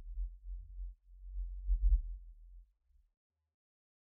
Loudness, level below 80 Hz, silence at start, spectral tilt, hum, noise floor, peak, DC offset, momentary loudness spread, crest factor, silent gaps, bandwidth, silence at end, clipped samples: -42 LUFS; -40 dBFS; 0 s; -30 dB/octave; none; -71 dBFS; -20 dBFS; under 0.1%; 23 LU; 20 dB; none; 0.1 kHz; 1.45 s; under 0.1%